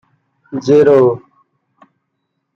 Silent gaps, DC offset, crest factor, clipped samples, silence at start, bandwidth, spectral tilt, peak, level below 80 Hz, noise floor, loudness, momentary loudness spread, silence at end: none; under 0.1%; 14 dB; under 0.1%; 0.5 s; 7 kHz; -7.5 dB/octave; -2 dBFS; -62 dBFS; -71 dBFS; -11 LUFS; 18 LU; 1.35 s